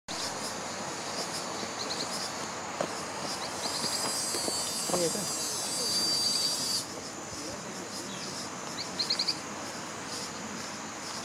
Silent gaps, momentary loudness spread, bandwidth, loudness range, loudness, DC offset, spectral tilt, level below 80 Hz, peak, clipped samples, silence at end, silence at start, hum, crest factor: none; 11 LU; 16 kHz; 6 LU; -31 LUFS; under 0.1%; -1.5 dB/octave; -68 dBFS; -14 dBFS; under 0.1%; 0 s; 0.1 s; none; 20 dB